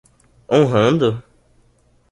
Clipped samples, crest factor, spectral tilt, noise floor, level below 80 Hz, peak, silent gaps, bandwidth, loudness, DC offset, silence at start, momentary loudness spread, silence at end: under 0.1%; 18 dB; -7 dB/octave; -57 dBFS; -52 dBFS; -2 dBFS; none; 11 kHz; -16 LUFS; under 0.1%; 0.5 s; 8 LU; 0.9 s